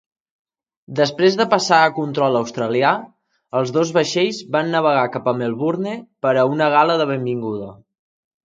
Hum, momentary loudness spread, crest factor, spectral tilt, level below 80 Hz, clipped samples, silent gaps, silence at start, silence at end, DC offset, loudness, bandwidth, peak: none; 10 LU; 18 dB; -5 dB/octave; -66 dBFS; under 0.1%; none; 0.9 s; 0.7 s; under 0.1%; -18 LUFS; 9.2 kHz; 0 dBFS